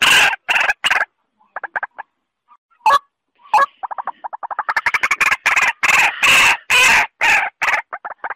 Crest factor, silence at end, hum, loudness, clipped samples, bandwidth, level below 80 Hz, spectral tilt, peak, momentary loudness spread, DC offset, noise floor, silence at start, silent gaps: 14 dB; 0 s; none; -14 LUFS; under 0.1%; 16 kHz; -52 dBFS; 0.5 dB/octave; -4 dBFS; 17 LU; under 0.1%; -61 dBFS; 0 s; 2.58-2.69 s